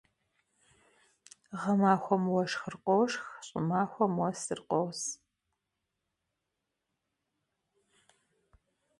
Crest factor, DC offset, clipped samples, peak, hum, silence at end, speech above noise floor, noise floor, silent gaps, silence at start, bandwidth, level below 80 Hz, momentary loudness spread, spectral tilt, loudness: 24 dB; under 0.1%; under 0.1%; -12 dBFS; none; 3.85 s; 55 dB; -85 dBFS; none; 1.5 s; 11.5 kHz; -74 dBFS; 12 LU; -5.5 dB/octave; -31 LUFS